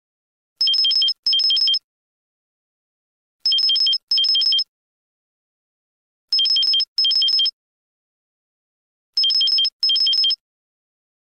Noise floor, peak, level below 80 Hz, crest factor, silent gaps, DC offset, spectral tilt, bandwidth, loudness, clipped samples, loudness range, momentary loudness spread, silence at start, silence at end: under -90 dBFS; -10 dBFS; -80 dBFS; 10 dB; 1.19-1.23 s, 1.84-3.39 s, 4.03-4.07 s, 4.68-6.28 s, 6.88-6.96 s, 7.53-9.13 s, 9.72-9.80 s; under 0.1%; 3.5 dB/octave; 13.5 kHz; -16 LUFS; under 0.1%; 1 LU; 6 LU; 0.6 s; 0.95 s